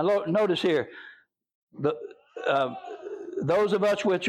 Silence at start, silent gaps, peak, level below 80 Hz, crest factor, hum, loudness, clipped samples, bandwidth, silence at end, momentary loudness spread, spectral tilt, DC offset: 0 s; 1.55-1.67 s; -12 dBFS; -70 dBFS; 14 dB; none; -26 LUFS; under 0.1%; 13 kHz; 0 s; 15 LU; -6 dB/octave; under 0.1%